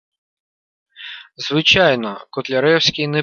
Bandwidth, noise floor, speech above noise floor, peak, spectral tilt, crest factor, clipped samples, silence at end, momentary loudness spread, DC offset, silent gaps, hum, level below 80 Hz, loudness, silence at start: 7.4 kHz; -36 dBFS; 20 dB; 0 dBFS; -4 dB/octave; 18 dB; under 0.1%; 0 s; 21 LU; under 0.1%; none; none; -50 dBFS; -15 LUFS; 1 s